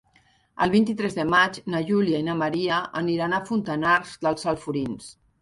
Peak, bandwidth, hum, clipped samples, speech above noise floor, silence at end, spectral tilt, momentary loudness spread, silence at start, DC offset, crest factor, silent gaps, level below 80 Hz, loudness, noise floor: -6 dBFS; 11.5 kHz; none; under 0.1%; 38 dB; 0.3 s; -5.5 dB/octave; 8 LU; 0.55 s; under 0.1%; 18 dB; none; -58 dBFS; -24 LUFS; -62 dBFS